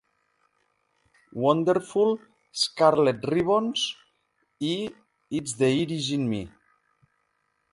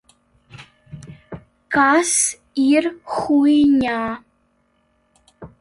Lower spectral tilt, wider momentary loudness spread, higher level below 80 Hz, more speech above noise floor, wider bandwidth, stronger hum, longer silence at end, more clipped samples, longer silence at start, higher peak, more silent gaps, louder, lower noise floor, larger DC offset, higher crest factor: first, -5 dB/octave vs -3 dB/octave; second, 13 LU vs 25 LU; second, -62 dBFS vs -54 dBFS; about the same, 49 dB vs 47 dB; about the same, 11.5 kHz vs 11.5 kHz; neither; first, 1.25 s vs 0.15 s; neither; first, 1.35 s vs 0.55 s; about the same, -6 dBFS vs -4 dBFS; neither; second, -25 LUFS vs -17 LUFS; first, -73 dBFS vs -64 dBFS; neither; first, 22 dB vs 16 dB